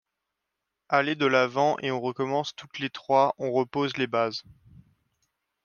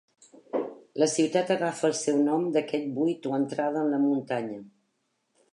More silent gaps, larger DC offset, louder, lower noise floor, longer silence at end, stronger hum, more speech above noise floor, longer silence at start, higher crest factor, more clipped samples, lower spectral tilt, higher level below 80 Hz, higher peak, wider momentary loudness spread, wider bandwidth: neither; neither; about the same, -26 LUFS vs -27 LUFS; first, -84 dBFS vs -76 dBFS; first, 1.25 s vs 0.85 s; neither; first, 58 dB vs 49 dB; first, 0.9 s vs 0.55 s; about the same, 20 dB vs 18 dB; neither; about the same, -5.5 dB/octave vs -5 dB/octave; first, -72 dBFS vs -82 dBFS; about the same, -8 dBFS vs -10 dBFS; first, 11 LU vs 8 LU; second, 7.2 kHz vs 11.5 kHz